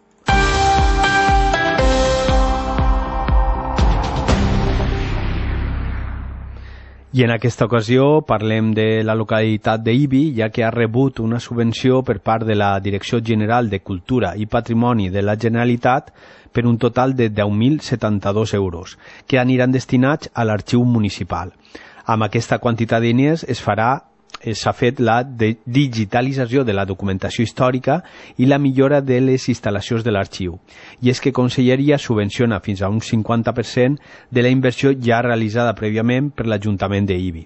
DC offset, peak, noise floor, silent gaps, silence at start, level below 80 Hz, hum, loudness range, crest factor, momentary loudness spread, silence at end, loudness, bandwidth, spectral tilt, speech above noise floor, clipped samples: under 0.1%; -2 dBFS; -37 dBFS; none; 0.25 s; -28 dBFS; none; 2 LU; 16 dB; 8 LU; 0 s; -18 LUFS; 8.4 kHz; -6.5 dB/octave; 20 dB; under 0.1%